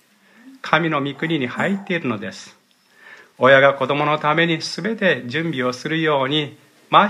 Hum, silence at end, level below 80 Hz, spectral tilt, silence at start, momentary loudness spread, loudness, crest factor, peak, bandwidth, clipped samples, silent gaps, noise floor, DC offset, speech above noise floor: none; 0 s; -68 dBFS; -5.5 dB/octave; 0.45 s; 11 LU; -19 LUFS; 20 dB; 0 dBFS; 11.5 kHz; under 0.1%; none; -50 dBFS; under 0.1%; 31 dB